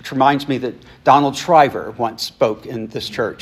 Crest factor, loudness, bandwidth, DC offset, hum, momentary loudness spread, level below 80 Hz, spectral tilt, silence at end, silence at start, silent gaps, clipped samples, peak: 18 dB; -17 LUFS; 14.5 kHz; under 0.1%; none; 12 LU; -56 dBFS; -5 dB/octave; 0.05 s; 0.05 s; none; under 0.1%; 0 dBFS